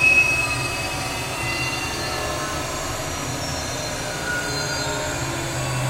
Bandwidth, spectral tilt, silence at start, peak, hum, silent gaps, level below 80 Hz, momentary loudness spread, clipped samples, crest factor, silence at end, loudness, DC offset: 16 kHz; -3 dB/octave; 0 s; -6 dBFS; none; none; -40 dBFS; 7 LU; under 0.1%; 18 dB; 0 s; -23 LUFS; under 0.1%